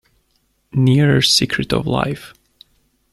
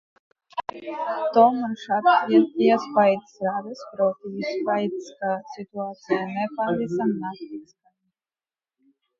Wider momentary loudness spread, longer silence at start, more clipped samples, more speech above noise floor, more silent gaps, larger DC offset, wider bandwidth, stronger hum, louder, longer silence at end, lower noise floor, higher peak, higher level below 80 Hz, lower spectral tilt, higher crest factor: second, 12 LU vs 15 LU; first, 0.75 s vs 0.55 s; neither; second, 48 dB vs over 67 dB; neither; neither; first, 13.5 kHz vs 7.4 kHz; neither; first, -16 LUFS vs -23 LUFS; second, 0.85 s vs 1.55 s; second, -64 dBFS vs under -90 dBFS; about the same, -2 dBFS vs -2 dBFS; first, -44 dBFS vs -72 dBFS; second, -4.5 dB/octave vs -6.5 dB/octave; about the same, 18 dB vs 22 dB